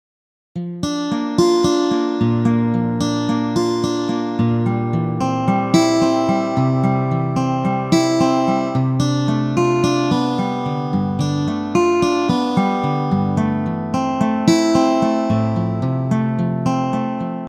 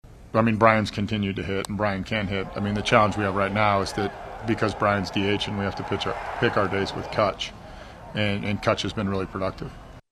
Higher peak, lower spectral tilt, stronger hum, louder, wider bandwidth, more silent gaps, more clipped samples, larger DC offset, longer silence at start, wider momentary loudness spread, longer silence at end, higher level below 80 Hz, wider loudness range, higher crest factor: about the same, 0 dBFS vs 0 dBFS; about the same, -6.5 dB/octave vs -5.5 dB/octave; neither; first, -18 LUFS vs -25 LUFS; about the same, 13 kHz vs 13 kHz; neither; neither; neither; first, 0.55 s vs 0.05 s; second, 6 LU vs 11 LU; about the same, 0 s vs 0.1 s; about the same, -50 dBFS vs -46 dBFS; about the same, 1 LU vs 3 LU; second, 16 dB vs 24 dB